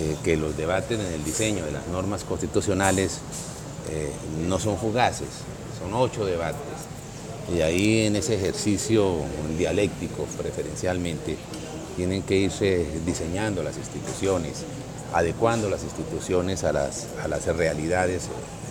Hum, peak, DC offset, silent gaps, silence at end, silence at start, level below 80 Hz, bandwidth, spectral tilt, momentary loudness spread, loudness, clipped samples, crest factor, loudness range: none; -6 dBFS; under 0.1%; none; 0 s; 0 s; -44 dBFS; 17.5 kHz; -5 dB/octave; 12 LU; -26 LUFS; under 0.1%; 20 dB; 3 LU